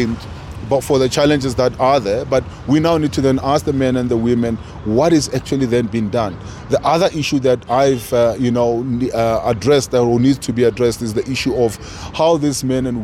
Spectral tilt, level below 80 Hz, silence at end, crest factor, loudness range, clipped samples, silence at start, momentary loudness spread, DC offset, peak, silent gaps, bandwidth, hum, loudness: -6 dB/octave; -38 dBFS; 0 s; 12 dB; 1 LU; under 0.1%; 0 s; 6 LU; under 0.1%; -4 dBFS; none; 16 kHz; none; -16 LUFS